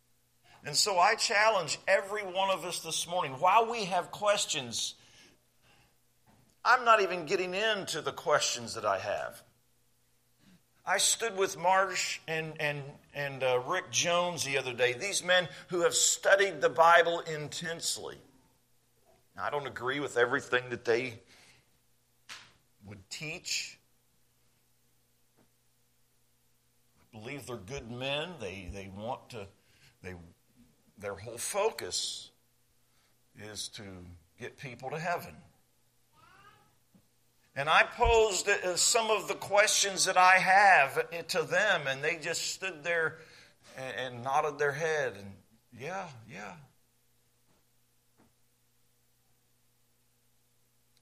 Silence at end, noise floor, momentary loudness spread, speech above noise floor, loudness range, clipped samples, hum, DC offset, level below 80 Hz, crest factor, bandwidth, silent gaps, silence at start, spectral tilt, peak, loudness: 4.4 s; -72 dBFS; 19 LU; 42 dB; 16 LU; under 0.1%; 60 Hz at -70 dBFS; under 0.1%; -58 dBFS; 24 dB; 15 kHz; none; 0.65 s; -1.5 dB/octave; -8 dBFS; -29 LUFS